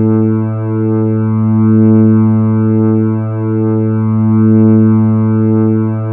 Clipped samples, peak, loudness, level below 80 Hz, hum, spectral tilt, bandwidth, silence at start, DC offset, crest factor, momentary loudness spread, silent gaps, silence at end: under 0.1%; 0 dBFS; -11 LUFS; -58 dBFS; none; -14 dB/octave; 2.8 kHz; 0 s; under 0.1%; 8 dB; 7 LU; none; 0 s